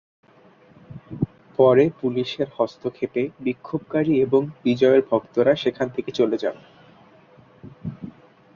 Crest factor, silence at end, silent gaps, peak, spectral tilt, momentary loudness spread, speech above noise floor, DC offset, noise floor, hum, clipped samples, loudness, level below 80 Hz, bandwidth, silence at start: 20 dB; 0.45 s; none; -4 dBFS; -7.5 dB/octave; 17 LU; 32 dB; under 0.1%; -53 dBFS; none; under 0.1%; -22 LUFS; -60 dBFS; 7 kHz; 0.9 s